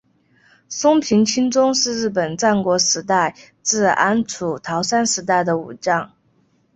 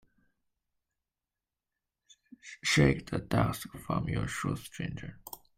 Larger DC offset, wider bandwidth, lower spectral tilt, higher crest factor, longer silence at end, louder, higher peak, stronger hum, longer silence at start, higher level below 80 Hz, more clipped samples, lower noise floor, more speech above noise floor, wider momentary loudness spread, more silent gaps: neither; second, 8.4 kHz vs 16 kHz; second, -3 dB/octave vs -5 dB/octave; second, 18 dB vs 24 dB; first, 0.7 s vs 0.2 s; first, -18 LUFS vs -31 LUFS; first, -2 dBFS vs -10 dBFS; neither; second, 0.7 s vs 2.45 s; second, -60 dBFS vs -52 dBFS; neither; second, -60 dBFS vs under -90 dBFS; second, 42 dB vs over 59 dB; second, 7 LU vs 19 LU; neither